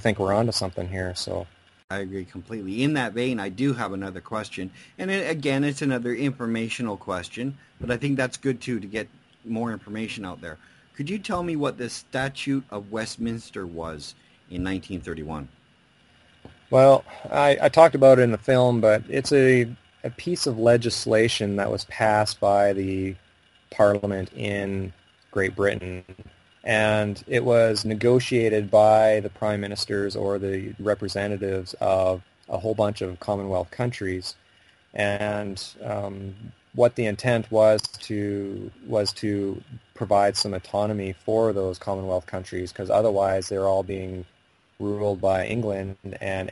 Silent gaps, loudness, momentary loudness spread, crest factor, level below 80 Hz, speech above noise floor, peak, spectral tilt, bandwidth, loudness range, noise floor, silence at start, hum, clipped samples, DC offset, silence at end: 1.84-1.88 s; -24 LUFS; 15 LU; 22 dB; -56 dBFS; 36 dB; -2 dBFS; -5.5 dB/octave; 11.5 kHz; 11 LU; -59 dBFS; 0 s; none; under 0.1%; under 0.1%; 0 s